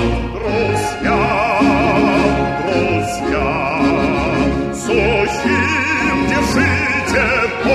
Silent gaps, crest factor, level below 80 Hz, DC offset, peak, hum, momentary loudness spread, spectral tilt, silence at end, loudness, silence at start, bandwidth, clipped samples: none; 14 dB; -30 dBFS; under 0.1%; -2 dBFS; none; 4 LU; -5.5 dB/octave; 0 s; -15 LUFS; 0 s; 14 kHz; under 0.1%